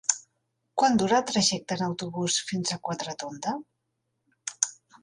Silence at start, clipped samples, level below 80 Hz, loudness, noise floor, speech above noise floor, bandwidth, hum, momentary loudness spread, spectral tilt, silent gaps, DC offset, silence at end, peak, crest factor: 0.1 s; under 0.1%; -66 dBFS; -27 LUFS; -79 dBFS; 52 dB; 11.5 kHz; none; 12 LU; -3 dB/octave; none; under 0.1%; 0.3 s; -2 dBFS; 26 dB